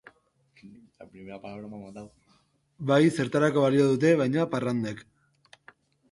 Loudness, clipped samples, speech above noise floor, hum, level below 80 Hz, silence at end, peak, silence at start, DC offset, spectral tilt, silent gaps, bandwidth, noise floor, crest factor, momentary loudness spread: -24 LUFS; under 0.1%; 40 dB; none; -68 dBFS; 1.1 s; -8 dBFS; 0.65 s; under 0.1%; -7 dB/octave; none; 11.5 kHz; -66 dBFS; 20 dB; 22 LU